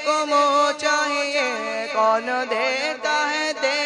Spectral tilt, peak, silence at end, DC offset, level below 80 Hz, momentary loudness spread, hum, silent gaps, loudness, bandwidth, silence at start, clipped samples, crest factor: -0.5 dB/octave; -6 dBFS; 0 s; under 0.1%; -78 dBFS; 5 LU; none; none; -21 LUFS; 10.5 kHz; 0 s; under 0.1%; 14 dB